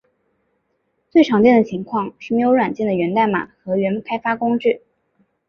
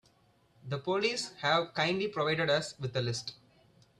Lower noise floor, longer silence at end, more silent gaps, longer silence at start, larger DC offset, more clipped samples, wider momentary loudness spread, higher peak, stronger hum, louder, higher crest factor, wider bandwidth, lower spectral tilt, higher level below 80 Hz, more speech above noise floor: about the same, -69 dBFS vs -67 dBFS; about the same, 0.7 s vs 0.65 s; neither; first, 1.15 s vs 0.65 s; neither; neither; about the same, 11 LU vs 10 LU; first, -2 dBFS vs -14 dBFS; neither; first, -18 LUFS vs -32 LUFS; about the same, 16 dB vs 20 dB; second, 6.8 kHz vs 12.5 kHz; first, -7.5 dB/octave vs -4.5 dB/octave; first, -60 dBFS vs -70 dBFS; first, 52 dB vs 35 dB